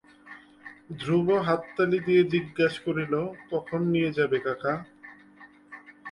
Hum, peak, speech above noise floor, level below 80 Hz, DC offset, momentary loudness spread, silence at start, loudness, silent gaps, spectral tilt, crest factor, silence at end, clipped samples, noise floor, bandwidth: none; -10 dBFS; 27 dB; -64 dBFS; under 0.1%; 24 LU; 0.25 s; -26 LUFS; none; -7.5 dB/octave; 18 dB; 0 s; under 0.1%; -53 dBFS; 11 kHz